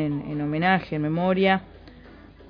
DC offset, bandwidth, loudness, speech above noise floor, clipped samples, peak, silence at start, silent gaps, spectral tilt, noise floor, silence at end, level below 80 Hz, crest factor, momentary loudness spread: under 0.1%; 5.2 kHz; -23 LUFS; 24 dB; under 0.1%; -6 dBFS; 0 s; none; -9 dB/octave; -47 dBFS; 0 s; -52 dBFS; 18 dB; 7 LU